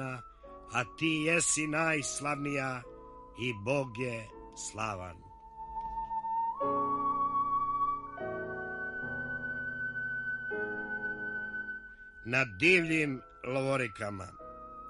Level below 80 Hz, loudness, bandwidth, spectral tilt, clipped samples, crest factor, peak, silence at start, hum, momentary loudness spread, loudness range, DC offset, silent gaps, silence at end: -60 dBFS; -33 LUFS; 11.5 kHz; -3.5 dB/octave; under 0.1%; 22 dB; -12 dBFS; 0 s; none; 18 LU; 6 LU; under 0.1%; none; 0 s